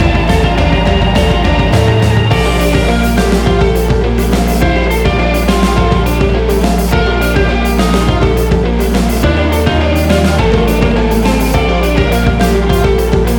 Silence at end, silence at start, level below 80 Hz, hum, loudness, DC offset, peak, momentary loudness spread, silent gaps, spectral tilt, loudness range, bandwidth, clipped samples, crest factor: 0 s; 0 s; -14 dBFS; none; -11 LUFS; under 0.1%; 0 dBFS; 2 LU; none; -6 dB/octave; 1 LU; 19.5 kHz; under 0.1%; 10 dB